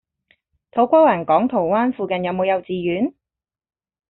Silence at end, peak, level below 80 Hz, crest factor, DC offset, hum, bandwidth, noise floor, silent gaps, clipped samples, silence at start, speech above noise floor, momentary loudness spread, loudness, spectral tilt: 1 s; -4 dBFS; -62 dBFS; 16 dB; under 0.1%; none; 4.1 kHz; -89 dBFS; none; under 0.1%; 0.75 s; 71 dB; 9 LU; -19 LUFS; -5 dB/octave